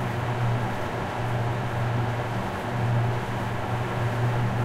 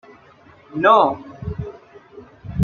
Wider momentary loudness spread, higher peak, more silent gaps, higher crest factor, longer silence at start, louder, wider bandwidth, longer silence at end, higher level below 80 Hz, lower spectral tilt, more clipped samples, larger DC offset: second, 4 LU vs 21 LU; second, -14 dBFS vs -2 dBFS; neither; second, 12 dB vs 20 dB; second, 0 s vs 0.75 s; second, -27 LUFS vs -18 LUFS; first, 13.5 kHz vs 6.8 kHz; about the same, 0 s vs 0 s; about the same, -44 dBFS vs -48 dBFS; about the same, -7 dB/octave vs -7.5 dB/octave; neither; neither